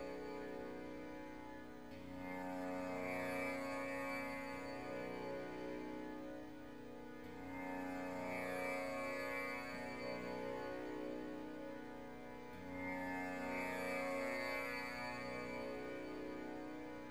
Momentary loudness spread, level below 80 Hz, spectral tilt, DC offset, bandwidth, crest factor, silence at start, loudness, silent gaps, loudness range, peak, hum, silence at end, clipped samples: 10 LU; -70 dBFS; -5 dB/octave; 0.1%; over 20 kHz; 16 dB; 0 s; -46 LUFS; none; 4 LU; -30 dBFS; none; 0 s; under 0.1%